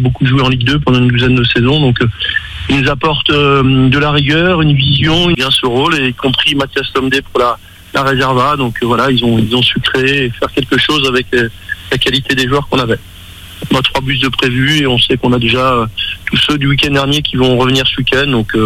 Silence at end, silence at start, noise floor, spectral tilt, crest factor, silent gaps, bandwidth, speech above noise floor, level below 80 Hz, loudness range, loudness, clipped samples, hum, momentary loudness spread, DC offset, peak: 0 s; 0 s; -32 dBFS; -5.5 dB/octave; 12 dB; none; 15.5 kHz; 21 dB; -32 dBFS; 3 LU; -11 LUFS; under 0.1%; none; 5 LU; under 0.1%; 0 dBFS